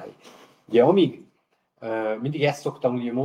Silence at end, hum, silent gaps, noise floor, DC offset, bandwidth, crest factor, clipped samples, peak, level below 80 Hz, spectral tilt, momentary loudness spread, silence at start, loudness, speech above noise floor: 0 s; none; none; -69 dBFS; under 0.1%; 13 kHz; 18 dB; under 0.1%; -6 dBFS; -76 dBFS; -7 dB/octave; 12 LU; 0 s; -23 LUFS; 47 dB